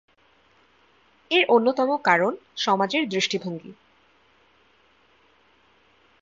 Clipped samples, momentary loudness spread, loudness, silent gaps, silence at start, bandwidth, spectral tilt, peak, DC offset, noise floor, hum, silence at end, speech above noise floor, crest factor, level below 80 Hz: under 0.1%; 10 LU; -22 LUFS; none; 1.3 s; 7.8 kHz; -4 dB/octave; -4 dBFS; under 0.1%; -61 dBFS; none; 2.5 s; 39 dB; 22 dB; -74 dBFS